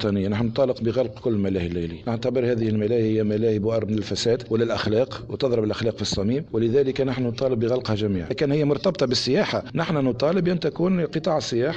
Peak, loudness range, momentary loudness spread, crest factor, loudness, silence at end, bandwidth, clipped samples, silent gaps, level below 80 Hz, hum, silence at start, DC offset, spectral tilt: -10 dBFS; 1 LU; 4 LU; 12 dB; -23 LUFS; 0 s; 9 kHz; under 0.1%; none; -50 dBFS; none; 0 s; under 0.1%; -6.5 dB/octave